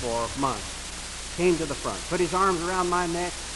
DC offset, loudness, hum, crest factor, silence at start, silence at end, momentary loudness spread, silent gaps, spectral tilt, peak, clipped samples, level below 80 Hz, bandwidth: under 0.1%; -27 LUFS; none; 16 dB; 0 s; 0 s; 11 LU; none; -4 dB/octave; -10 dBFS; under 0.1%; -42 dBFS; 12 kHz